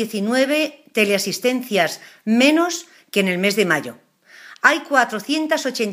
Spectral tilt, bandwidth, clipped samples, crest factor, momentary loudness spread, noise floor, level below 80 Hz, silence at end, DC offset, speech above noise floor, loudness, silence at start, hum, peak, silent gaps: -3.5 dB/octave; 15.5 kHz; under 0.1%; 20 dB; 8 LU; -45 dBFS; -74 dBFS; 0 s; under 0.1%; 26 dB; -19 LUFS; 0 s; none; 0 dBFS; none